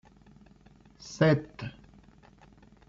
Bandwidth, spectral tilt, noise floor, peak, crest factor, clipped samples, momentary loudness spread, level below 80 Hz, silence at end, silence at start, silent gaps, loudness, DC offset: 7.6 kHz; -6.5 dB/octave; -57 dBFS; -12 dBFS; 22 dB; under 0.1%; 21 LU; -60 dBFS; 1.2 s; 1.05 s; none; -28 LUFS; under 0.1%